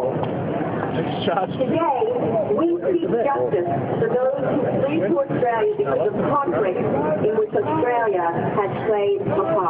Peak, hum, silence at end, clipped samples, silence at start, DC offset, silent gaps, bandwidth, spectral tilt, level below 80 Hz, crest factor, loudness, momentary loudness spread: -8 dBFS; none; 0 s; under 0.1%; 0 s; under 0.1%; none; 4.8 kHz; -12 dB/octave; -56 dBFS; 12 dB; -21 LUFS; 3 LU